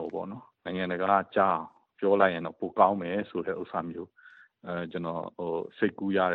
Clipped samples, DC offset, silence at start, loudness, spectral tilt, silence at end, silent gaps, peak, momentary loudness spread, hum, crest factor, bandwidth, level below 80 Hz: under 0.1%; under 0.1%; 0 s; -29 LUFS; -9.5 dB/octave; 0 s; none; -6 dBFS; 16 LU; none; 22 dB; 4.6 kHz; -70 dBFS